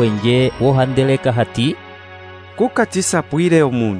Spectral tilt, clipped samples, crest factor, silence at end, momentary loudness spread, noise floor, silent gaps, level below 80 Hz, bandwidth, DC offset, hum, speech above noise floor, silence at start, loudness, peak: -5.5 dB/octave; under 0.1%; 14 dB; 0 s; 21 LU; -36 dBFS; none; -46 dBFS; 11 kHz; under 0.1%; none; 21 dB; 0 s; -16 LUFS; -2 dBFS